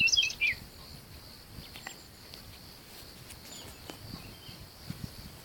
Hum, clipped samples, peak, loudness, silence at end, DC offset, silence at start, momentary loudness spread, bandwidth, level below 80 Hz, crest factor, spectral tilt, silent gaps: none; under 0.1%; -14 dBFS; -34 LUFS; 0 s; under 0.1%; 0 s; 19 LU; 17.5 kHz; -56 dBFS; 22 dB; -1 dB/octave; none